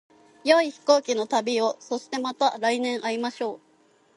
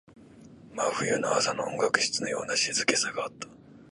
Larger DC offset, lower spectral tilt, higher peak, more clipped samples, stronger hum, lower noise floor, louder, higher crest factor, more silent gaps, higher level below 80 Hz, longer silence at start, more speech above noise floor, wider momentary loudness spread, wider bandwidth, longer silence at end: neither; about the same, -2.5 dB/octave vs -1.5 dB/octave; about the same, -4 dBFS vs -6 dBFS; neither; neither; first, -61 dBFS vs -51 dBFS; about the same, -25 LUFS vs -27 LUFS; about the same, 20 dB vs 24 dB; neither; second, -80 dBFS vs -68 dBFS; first, 0.45 s vs 0.1 s; first, 37 dB vs 23 dB; about the same, 11 LU vs 13 LU; about the same, 11.5 kHz vs 11.5 kHz; first, 0.6 s vs 0.05 s